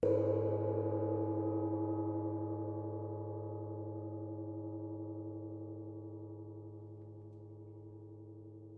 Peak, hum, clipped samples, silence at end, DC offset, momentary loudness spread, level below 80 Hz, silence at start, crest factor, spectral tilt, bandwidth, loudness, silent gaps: -20 dBFS; none; under 0.1%; 0 s; under 0.1%; 17 LU; -74 dBFS; 0 s; 18 dB; -12 dB/octave; 3 kHz; -40 LUFS; none